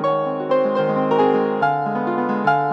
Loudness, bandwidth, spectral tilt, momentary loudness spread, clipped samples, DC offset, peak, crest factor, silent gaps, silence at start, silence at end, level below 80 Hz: -19 LUFS; 6.4 kHz; -8 dB/octave; 5 LU; under 0.1%; under 0.1%; -4 dBFS; 14 dB; none; 0 s; 0 s; -66 dBFS